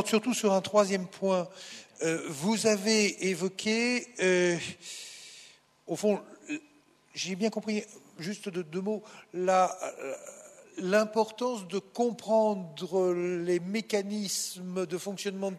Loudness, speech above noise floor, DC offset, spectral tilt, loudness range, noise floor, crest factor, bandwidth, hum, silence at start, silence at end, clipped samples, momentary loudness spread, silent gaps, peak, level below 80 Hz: -30 LUFS; 32 dB; under 0.1%; -4 dB/octave; 7 LU; -62 dBFS; 18 dB; 13.5 kHz; none; 0 s; 0 s; under 0.1%; 15 LU; none; -12 dBFS; -80 dBFS